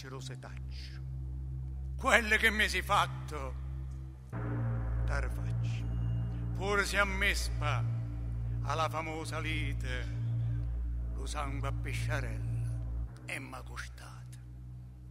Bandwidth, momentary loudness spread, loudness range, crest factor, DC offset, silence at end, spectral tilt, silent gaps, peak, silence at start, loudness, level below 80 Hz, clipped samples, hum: 15.5 kHz; 16 LU; 7 LU; 26 dB; under 0.1%; 0 s; -4.5 dB/octave; none; -8 dBFS; 0 s; -34 LUFS; -40 dBFS; under 0.1%; none